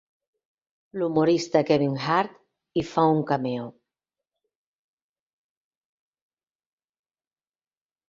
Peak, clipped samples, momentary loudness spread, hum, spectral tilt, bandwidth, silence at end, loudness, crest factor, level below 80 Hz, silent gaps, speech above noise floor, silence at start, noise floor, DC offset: -6 dBFS; under 0.1%; 12 LU; none; -6.5 dB/octave; 7.8 kHz; 4.4 s; -24 LUFS; 22 dB; -66 dBFS; none; over 67 dB; 0.95 s; under -90 dBFS; under 0.1%